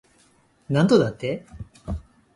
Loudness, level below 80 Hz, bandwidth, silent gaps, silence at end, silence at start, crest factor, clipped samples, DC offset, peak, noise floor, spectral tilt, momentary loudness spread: -22 LUFS; -44 dBFS; 11.5 kHz; none; 0.35 s; 0.7 s; 20 dB; under 0.1%; under 0.1%; -4 dBFS; -60 dBFS; -7 dB/octave; 19 LU